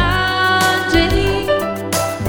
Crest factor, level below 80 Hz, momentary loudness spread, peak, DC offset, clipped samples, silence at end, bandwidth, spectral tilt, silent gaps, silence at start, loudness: 14 dB; -28 dBFS; 6 LU; -2 dBFS; under 0.1%; under 0.1%; 0 s; over 20 kHz; -4 dB/octave; none; 0 s; -15 LUFS